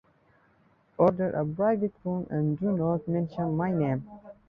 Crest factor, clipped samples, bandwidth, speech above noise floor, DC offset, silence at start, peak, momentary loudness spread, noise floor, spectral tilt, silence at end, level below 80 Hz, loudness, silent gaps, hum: 20 dB; under 0.1%; 5.2 kHz; 37 dB; under 0.1%; 1 s; -8 dBFS; 8 LU; -64 dBFS; -11.5 dB/octave; 0.15 s; -60 dBFS; -28 LUFS; none; none